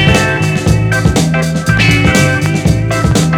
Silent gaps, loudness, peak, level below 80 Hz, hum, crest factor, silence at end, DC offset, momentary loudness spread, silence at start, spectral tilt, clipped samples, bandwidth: none; -11 LUFS; 0 dBFS; -24 dBFS; none; 10 dB; 0 s; under 0.1%; 4 LU; 0 s; -5 dB/octave; 0.3%; 17 kHz